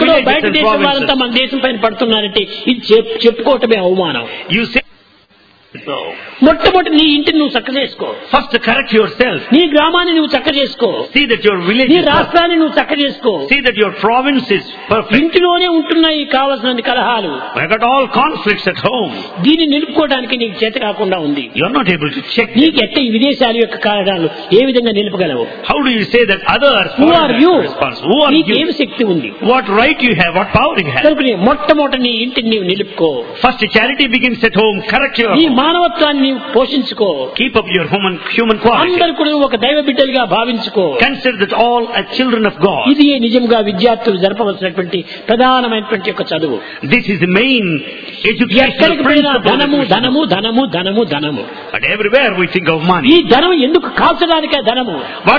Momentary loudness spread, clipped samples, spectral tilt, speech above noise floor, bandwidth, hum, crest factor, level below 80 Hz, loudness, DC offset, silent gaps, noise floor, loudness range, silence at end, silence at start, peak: 7 LU; 0.3%; -7 dB/octave; 35 dB; 5.4 kHz; none; 12 dB; -42 dBFS; -11 LUFS; under 0.1%; none; -47 dBFS; 2 LU; 0 s; 0 s; 0 dBFS